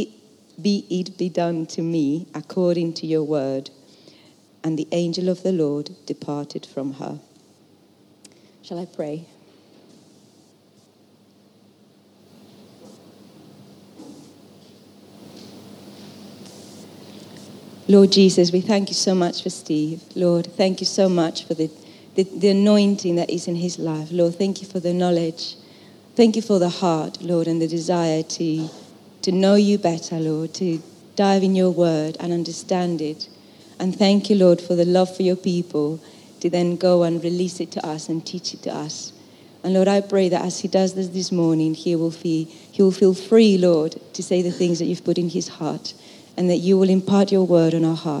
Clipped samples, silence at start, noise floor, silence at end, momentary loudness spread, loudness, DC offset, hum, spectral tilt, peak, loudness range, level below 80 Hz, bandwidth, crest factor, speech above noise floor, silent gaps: under 0.1%; 0 s; -55 dBFS; 0 s; 16 LU; -20 LUFS; under 0.1%; none; -6 dB/octave; -2 dBFS; 10 LU; -76 dBFS; 12 kHz; 20 dB; 35 dB; none